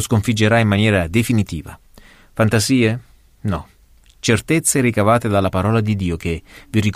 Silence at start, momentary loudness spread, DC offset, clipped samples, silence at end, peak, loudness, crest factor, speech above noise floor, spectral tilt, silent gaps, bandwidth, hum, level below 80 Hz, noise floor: 0 s; 12 LU; under 0.1%; under 0.1%; 0.05 s; -2 dBFS; -17 LUFS; 14 dB; 33 dB; -5 dB/octave; none; 15.5 kHz; none; -40 dBFS; -50 dBFS